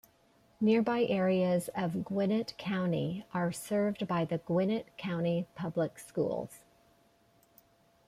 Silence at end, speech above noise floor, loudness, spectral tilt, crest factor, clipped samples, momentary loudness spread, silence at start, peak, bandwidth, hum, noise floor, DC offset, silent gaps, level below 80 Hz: 1.5 s; 35 dB; -32 LUFS; -7 dB/octave; 16 dB; under 0.1%; 7 LU; 0.6 s; -16 dBFS; 15.5 kHz; none; -67 dBFS; under 0.1%; none; -70 dBFS